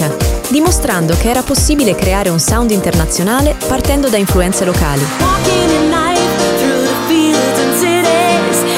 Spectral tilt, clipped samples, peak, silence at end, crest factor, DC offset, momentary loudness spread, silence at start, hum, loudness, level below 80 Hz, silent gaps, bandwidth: -4.5 dB/octave; under 0.1%; 0 dBFS; 0 s; 12 dB; under 0.1%; 3 LU; 0 s; none; -12 LUFS; -22 dBFS; none; 17 kHz